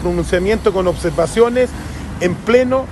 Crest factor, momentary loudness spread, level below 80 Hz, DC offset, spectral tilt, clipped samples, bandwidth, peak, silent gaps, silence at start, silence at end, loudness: 14 dB; 7 LU; -30 dBFS; under 0.1%; -6 dB/octave; under 0.1%; 12.5 kHz; 0 dBFS; none; 0 s; 0 s; -16 LUFS